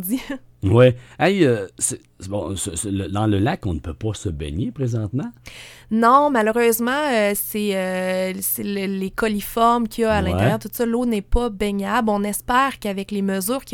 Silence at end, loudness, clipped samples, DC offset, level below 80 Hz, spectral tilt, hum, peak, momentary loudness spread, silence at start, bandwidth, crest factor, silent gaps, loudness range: 0 s; -20 LUFS; under 0.1%; under 0.1%; -38 dBFS; -5 dB/octave; none; -2 dBFS; 11 LU; 0 s; 19 kHz; 18 dB; none; 5 LU